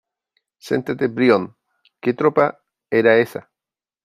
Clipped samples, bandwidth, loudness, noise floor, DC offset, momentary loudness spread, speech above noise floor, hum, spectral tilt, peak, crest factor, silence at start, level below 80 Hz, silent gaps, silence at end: under 0.1%; 14.5 kHz; -19 LUFS; -90 dBFS; under 0.1%; 10 LU; 72 dB; none; -7 dB/octave; -2 dBFS; 18 dB; 0.65 s; -66 dBFS; none; 0.65 s